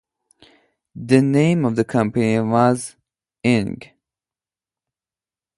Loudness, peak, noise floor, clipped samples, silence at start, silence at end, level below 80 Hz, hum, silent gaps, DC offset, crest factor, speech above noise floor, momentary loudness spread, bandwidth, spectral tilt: -18 LUFS; -2 dBFS; under -90 dBFS; under 0.1%; 0.95 s; 1.75 s; -56 dBFS; none; none; under 0.1%; 20 dB; over 73 dB; 14 LU; 11.5 kHz; -7 dB/octave